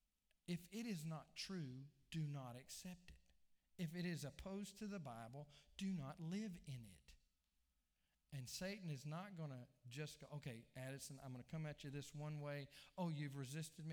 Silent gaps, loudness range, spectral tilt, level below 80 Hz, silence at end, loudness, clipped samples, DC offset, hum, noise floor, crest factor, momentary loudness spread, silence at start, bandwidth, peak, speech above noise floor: none; 3 LU; -5.5 dB/octave; -74 dBFS; 0 s; -52 LUFS; under 0.1%; under 0.1%; none; -87 dBFS; 16 dB; 9 LU; 0.5 s; over 20 kHz; -34 dBFS; 36 dB